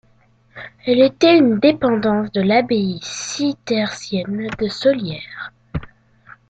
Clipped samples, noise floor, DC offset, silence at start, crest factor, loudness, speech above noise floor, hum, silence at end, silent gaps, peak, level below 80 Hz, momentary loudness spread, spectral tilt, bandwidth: under 0.1%; -55 dBFS; under 0.1%; 0.55 s; 16 dB; -17 LUFS; 38 dB; none; 0.6 s; none; -2 dBFS; -48 dBFS; 18 LU; -5 dB/octave; 9 kHz